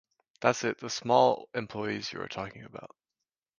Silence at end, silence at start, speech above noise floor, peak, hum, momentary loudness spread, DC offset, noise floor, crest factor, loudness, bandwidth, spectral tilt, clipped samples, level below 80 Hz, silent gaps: 0.75 s; 0.4 s; 59 dB; -6 dBFS; none; 19 LU; under 0.1%; -89 dBFS; 24 dB; -30 LUFS; 10 kHz; -4 dB/octave; under 0.1%; -68 dBFS; none